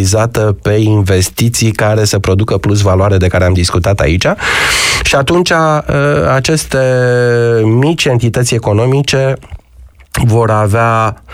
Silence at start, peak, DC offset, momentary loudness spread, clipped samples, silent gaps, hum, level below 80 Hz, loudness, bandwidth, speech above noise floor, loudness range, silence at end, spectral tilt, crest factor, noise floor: 0 s; 0 dBFS; under 0.1%; 2 LU; under 0.1%; none; none; -30 dBFS; -10 LUFS; 16 kHz; 28 dB; 2 LU; 0 s; -5 dB/octave; 10 dB; -38 dBFS